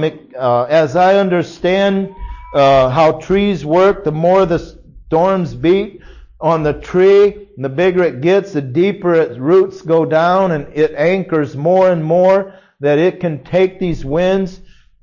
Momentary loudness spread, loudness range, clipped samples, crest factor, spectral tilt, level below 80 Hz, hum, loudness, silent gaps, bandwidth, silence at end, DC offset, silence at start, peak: 9 LU; 2 LU; under 0.1%; 10 dB; -7.5 dB/octave; -40 dBFS; none; -14 LUFS; none; 7.4 kHz; 0.45 s; under 0.1%; 0 s; -4 dBFS